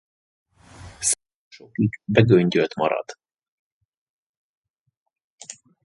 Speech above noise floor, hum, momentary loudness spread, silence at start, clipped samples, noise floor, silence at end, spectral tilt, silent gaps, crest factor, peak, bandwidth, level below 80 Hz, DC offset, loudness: 25 dB; none; 24 LU; 0.8 s; under 0.1%; -45 dBFS; 0.35 s; -5 dB/octave; 1.35-1.51 s, 3.48-4.64 s, 4.70-4.86 s, 4.97-5.06 s, 5.24-5.38 s; 24 dB; -2 dBFS; 11.5 kHz; -54 dBFS; under 0.1%; -21 LUFS